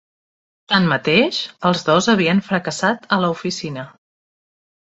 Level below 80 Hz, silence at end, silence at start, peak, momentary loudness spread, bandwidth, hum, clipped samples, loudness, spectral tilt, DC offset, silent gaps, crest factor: -58 dBFS; 1.05 s; 0.7 s; -2 dBFS; 11 LU; 8.2 kHz; none; under 0.1%; -18 LUFS; -5 dB/octave; under 0.1%; none; 18 dB